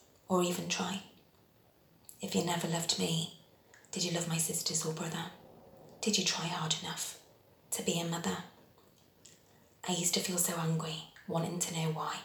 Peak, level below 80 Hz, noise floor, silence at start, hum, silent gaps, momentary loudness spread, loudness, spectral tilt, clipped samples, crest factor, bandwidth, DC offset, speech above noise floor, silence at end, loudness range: -16 dBFS; -76 dBFS; -65 dBFS; 0.3 s; none; none; 12 LU; -34 LUFS; -3.5 dB/octave; under 0.1%; 22 dB; over 20 kHz; under 0.1%; 31 dB; 0 s; 3 LU